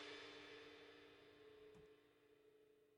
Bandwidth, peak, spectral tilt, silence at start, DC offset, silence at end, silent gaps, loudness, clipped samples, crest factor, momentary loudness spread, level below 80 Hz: 16 kHz; -44 dBFS; -3 dB/octave; 0 s; under 0.1%; 0 s; none; -61 LUFS; under 0.1%; 18 dB; 10 LU; -88 dBFS